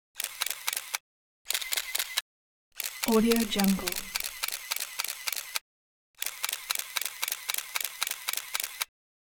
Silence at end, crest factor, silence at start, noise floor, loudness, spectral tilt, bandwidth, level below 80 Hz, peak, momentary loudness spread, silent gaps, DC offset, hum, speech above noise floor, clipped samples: 0.4 s; 26 dB; 0.15 s; under -90 dBFS; -30 LUFS; -2.5 dB/octave; over 20 kHz; -58 dBFS; -6 dBFS; 10 LU; 1.00-1.45 s, 2.21-2.72 s, 5.61-6.14 s; under 0.1%; none; over 64 dB; under 0.1%